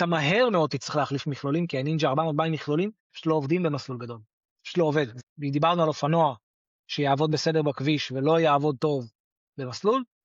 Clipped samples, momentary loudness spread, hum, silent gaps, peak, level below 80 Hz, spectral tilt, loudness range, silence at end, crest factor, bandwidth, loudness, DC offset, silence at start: under 0.1%; 12 LU; none; 3.00-3.10 s, 4.33-4.41 s, 4.51-4.56 s, 5.23-5.36 s, 6.43-6.84 s, 9.15-9.53 s; -10 dBFS; -70 dBFS; -6.5 dB/octave; 3 LU; 0.2 s; 14 dB; 7.6 kHz; -25 LUFS; under 0.1%; 0 s